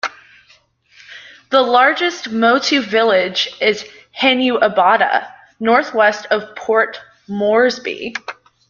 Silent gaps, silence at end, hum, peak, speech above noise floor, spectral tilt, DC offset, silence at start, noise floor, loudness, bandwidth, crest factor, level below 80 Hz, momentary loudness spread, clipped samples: none; 0.4 s; none; -2 dBFS; 38 dB; -3.5 dB/octave; under 0.1%; 0.05 s; -53 dBFS; -15 LUFS; 7.2 kHz; 16 dB; -62 dBFS; 14 LU; under 0.1%